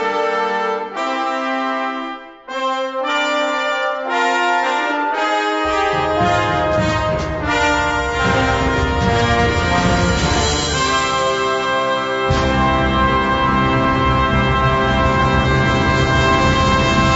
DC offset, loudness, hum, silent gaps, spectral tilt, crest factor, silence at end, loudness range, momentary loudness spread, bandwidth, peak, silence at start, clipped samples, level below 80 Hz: under 0.1%; -16 LUFS; none; none; -5 dB/octave; 14 dB; 0 s; 4 LU; 5 LU; 8 kHz; -2 dBFS; 0 s; under 0.1%; -28 dBFS